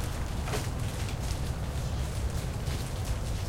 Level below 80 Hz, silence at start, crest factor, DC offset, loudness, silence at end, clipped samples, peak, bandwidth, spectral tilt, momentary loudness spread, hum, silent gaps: -36 dBFS; 0 s; 14 dB; under 0.1%; -34 LUFS; 0 s; under 0.1%; -18 dBFS; 16.5 kHz; -5 dB/octave; 1 LU; none; none